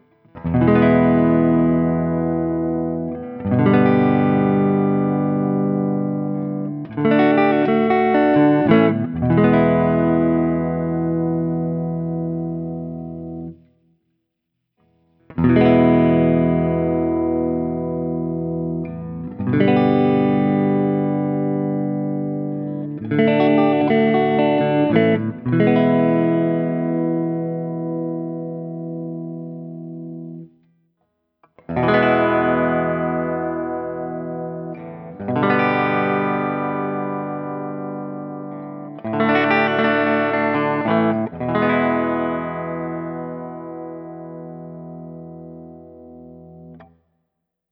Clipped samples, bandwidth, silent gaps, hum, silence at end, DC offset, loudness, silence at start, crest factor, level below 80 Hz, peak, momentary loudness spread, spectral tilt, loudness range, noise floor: under 0.1%; 5.6 kHz; none; 60 Hz at -60 dBFS; 0.85 s; under 0.1%; -19 LUFS; 0.35 s; 18 dB; -48 dBFS; 0 dBFS; 16 LU; -11 dB/octave; 12 LU; -76 dBFS